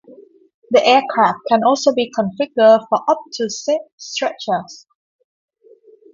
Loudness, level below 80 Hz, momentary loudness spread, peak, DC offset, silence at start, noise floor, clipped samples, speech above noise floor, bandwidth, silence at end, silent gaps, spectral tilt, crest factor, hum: -16 LUFS; -66 dBFS; 10 LU; 0 dBFS; under 0.1%; 0.1 s; -49 dBFS; under 0.1%; 33 dB; 7.6 kHz; 1.35 s; 0.54-0.62 s, 3.92-3.98 s; -4 dB/octave; 18 dB; none